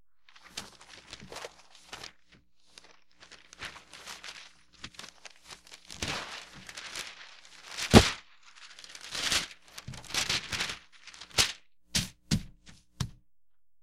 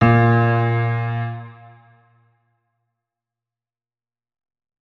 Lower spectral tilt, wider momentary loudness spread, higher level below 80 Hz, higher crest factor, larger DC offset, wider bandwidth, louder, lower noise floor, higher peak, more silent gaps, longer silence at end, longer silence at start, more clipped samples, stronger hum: second, -3.5 dB/octave vs -10 dB/octave; first, 22 LU vs 18 LU; about the same, -46 dBFS vs -50 dBFS; first, 34 dB vs 20 dB; neither; first, 16.5 kHz vs 4.5 kHz; second, -30 LUFS vs -18 LUFS; second, -85 dBFS vs under -90 dBFS; about the same, 0 dBFS vs 0 dBFS; neither; second, 0.7 s vs 3.3 s; first, 0.55 s vs 0 s; neither; neither